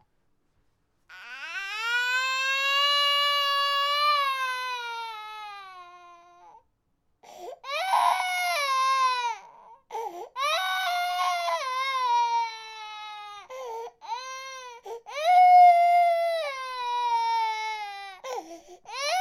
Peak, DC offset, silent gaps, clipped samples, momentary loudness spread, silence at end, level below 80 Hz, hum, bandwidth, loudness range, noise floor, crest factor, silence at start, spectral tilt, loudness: -10 dBFS; under 0.1%; none; under 0.1%; 19 LU; 0 s; -74 dBFS; none; 16.5 kHz; 9 LU; -72 dBFS; 18 dB; 1.1 s; 2 dB/octave; -24 LUFS